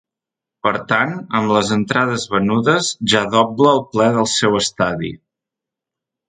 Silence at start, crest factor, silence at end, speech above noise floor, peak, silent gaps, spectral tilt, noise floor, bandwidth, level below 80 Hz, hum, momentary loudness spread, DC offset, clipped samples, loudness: 0.65 s; 18 dB; 1.15 s; 69 dB; 0 dBFS; none; -4 dB/octave; -86 dBFS; 9.6 kHz; -52 dBFS; none; 6 LU; under 0.1%; under 0.1%; -16 LUFS